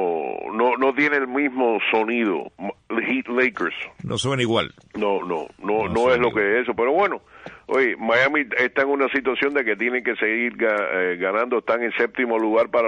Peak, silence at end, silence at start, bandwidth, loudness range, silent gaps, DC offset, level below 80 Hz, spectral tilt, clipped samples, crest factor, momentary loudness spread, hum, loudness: -6 dBFS; 0 s; 0 s; 10 kHz; 3 LU; none; under 0.1%; -58 dBFS; -5 dB/octave; under 0.1%; 14 dB; 8 LU; none; -21 LUFS